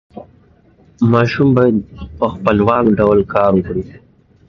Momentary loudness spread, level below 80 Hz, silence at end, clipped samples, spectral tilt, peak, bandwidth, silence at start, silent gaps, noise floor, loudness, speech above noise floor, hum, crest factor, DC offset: 11 LU; -38 dBFS; 0.55 s; under 0.1%; -9 dB/octave; 0 dBFS; 6.8 kHz; 0.15 s; none; -49 dBFS; -14 LUFS; 36 dB; none; 14 dB; under 0.1%